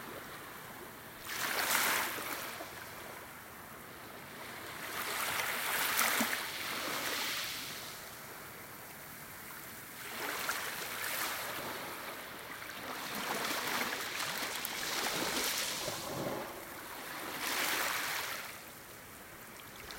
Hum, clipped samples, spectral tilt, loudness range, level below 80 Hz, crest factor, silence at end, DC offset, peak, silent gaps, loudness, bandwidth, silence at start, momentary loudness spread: none; under 0.1%; -1 dB/octave; 6 LU; -70 dBFS; 28 dB; 0 s; under 0.1%; -10 dBFS; none; -36 LUFS; 17 kHz; 0 s; 16 LU